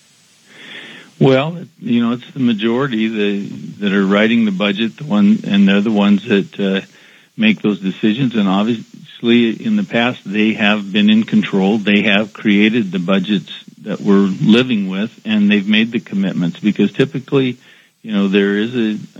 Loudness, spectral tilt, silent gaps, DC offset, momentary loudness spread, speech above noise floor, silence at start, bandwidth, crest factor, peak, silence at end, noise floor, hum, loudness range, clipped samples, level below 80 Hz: -15 LUFS; -7 dB/octave; none; under 0.1%; 9 LU; 36 dB; 0.6 s; 7.6 kHz; 14 dB; 0 dBFS; 0.15 s; -50 dBFS; none; 3 LU; under 0.1%; -70 dBFS